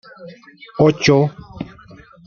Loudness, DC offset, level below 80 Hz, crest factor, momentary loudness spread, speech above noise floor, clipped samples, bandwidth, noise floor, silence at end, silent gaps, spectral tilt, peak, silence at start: -15 LUFS; under 0.1%; -50 dBFS; 18 dB; 20 LU; 26 dB; under 0.1%; 7 kHz; -43 dBFS; 0.6 s; none; -6 dB/octave; -2 dBFS; 0.2 s